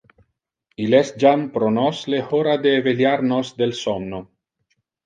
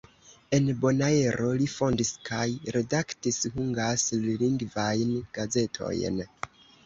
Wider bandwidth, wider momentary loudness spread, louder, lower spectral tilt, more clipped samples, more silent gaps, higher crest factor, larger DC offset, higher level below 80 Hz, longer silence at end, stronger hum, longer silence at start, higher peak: first, 9.2 kHz vs 8.2 kHz; first, 9 LU vs 6 LU; first, -19 LUFS vs -28 LUFS; about the same, -6 dB/octave vs -5 dB/octave; neither; neither; about the same, 18 dB vs 18 dB; neither; about the same, -60 dBFS vs -56 dBFS; first, 0.8 s vs 0.4 s; neither; first, 0.8 s vs 0.3 s; first, -2 dBFS vs -10 dBFS